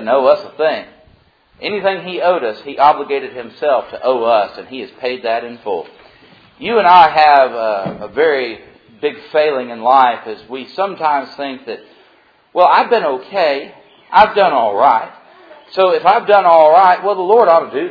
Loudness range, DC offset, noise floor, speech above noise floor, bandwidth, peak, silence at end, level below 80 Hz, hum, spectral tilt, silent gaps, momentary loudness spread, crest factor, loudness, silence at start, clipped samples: 6 LU; under 0.1%; -51 dBFS; 38 dB; 5.4 kHz; 0 dBFS; 0 s; -56 dBFS; none; -6 dB/octave; none; 16 LU; 14 dB; -13 LUFS; 0 s; 0.2%